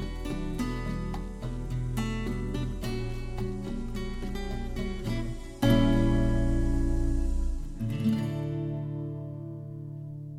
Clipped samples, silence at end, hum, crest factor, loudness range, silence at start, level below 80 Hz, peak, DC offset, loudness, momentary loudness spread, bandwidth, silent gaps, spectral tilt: under 0.1%; 0 s; none; 18 dB; 6 LU; 0 s; -32 dBFS; -12 dBFS; under 0.1%; -32 LUFS; 12 LU; 14.5 kHz; none; -7 dB/octave